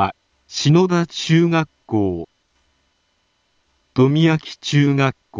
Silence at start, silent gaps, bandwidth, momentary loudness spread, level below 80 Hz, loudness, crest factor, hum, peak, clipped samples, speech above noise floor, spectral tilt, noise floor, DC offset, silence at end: 0 s; none; 7.6 kHz; 10 LU; -56 dBFS; -18 LUFS; 16 dB; none; -2 dBFS; under 0.1%; 49 dB; -6 dB/octave; -66 dBFS; under 0.1%; 0 s